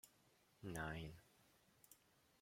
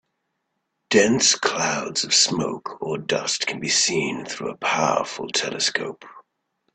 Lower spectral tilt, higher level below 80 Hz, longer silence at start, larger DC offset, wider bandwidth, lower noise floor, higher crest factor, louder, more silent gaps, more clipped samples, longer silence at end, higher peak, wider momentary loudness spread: first, -5 dB/octave vs -2 dB/octave; second, -70 dBFS vs -64 dBFS; second, 0.05 s vs 0.9 s; neither; first, 16.5 kHz vs 9.4 kHz; about the same, -76 dBFS vs -76 dBFS; about the same, 24 dB vs 20 dB; second, -52 LUFS vs -21 LUFS; neither; neither; about the same, 0.45 s vs 0.55 s; second, -32 dBFS vs -2 dBFS; first, 20 LU vs 12 LU